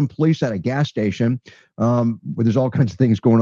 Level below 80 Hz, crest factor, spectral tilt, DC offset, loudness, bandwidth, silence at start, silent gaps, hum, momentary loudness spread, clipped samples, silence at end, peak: -56 dBFS; 16 dB; -8.5 dB/octave; under 0.1%; -20 LUFS; 7.2 kHz; 0 s; none; none; 5 LU; under 0.1%; 0 s; -4 dBFS